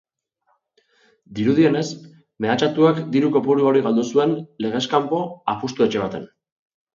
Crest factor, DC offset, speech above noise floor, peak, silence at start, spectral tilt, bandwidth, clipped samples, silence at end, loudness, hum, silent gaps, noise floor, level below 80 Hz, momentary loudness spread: 18 dB; under 0.1%; 49 dB; -4 dBFS; 1.3 s; -6.5 dB/octave; 7.6 kHz; under 0.1%; 0.7 s; -20 LUFS; none; none; -68 dBFS; -62 dBFS; 10 LU